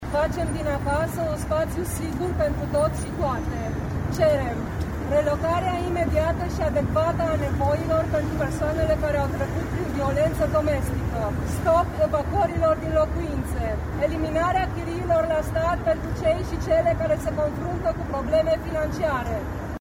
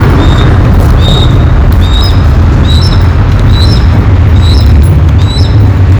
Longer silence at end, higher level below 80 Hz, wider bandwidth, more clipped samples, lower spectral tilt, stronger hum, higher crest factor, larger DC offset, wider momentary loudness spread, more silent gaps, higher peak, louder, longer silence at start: about the same, 0 s vs 0 s; second, -34 dBFS vs -8 dBFS; second, 18 kHz vs 20 kHz; second, under 0.1% vs 10%; about the same, -7 dB/octave vs -7 dB/octave; neither; first, 14 dB vs 4 dB; neither; first, 6 LU vs 2 LU; neither; second, -8 dBFS vs 0 dBFS; second, -24 LUFS vs -6 LUFS; about the same, 0 s vs 0 s